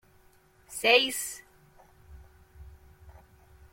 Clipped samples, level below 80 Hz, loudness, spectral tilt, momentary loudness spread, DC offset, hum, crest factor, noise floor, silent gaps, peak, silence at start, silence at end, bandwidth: under 0.1%; -58 dBFS; -25 LUFS; -1 dB/octave; 21 LU; under 0.1%; none; 26 dB; -61 dBFS; none; -8 dBFS; 0.7 s; 0.65 s; 16.5 kHz